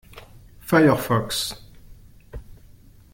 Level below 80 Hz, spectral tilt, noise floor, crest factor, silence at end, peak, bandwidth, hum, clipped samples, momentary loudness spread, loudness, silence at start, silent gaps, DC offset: -46 dBFS; -5 dB/octave; -49 dBFS; 20 dB; 0.6 s; -4 dBFS; 17 kHz; none; under 0.1%; 26 LU; -21 LUFS; 0.15 s; none; under 0.1%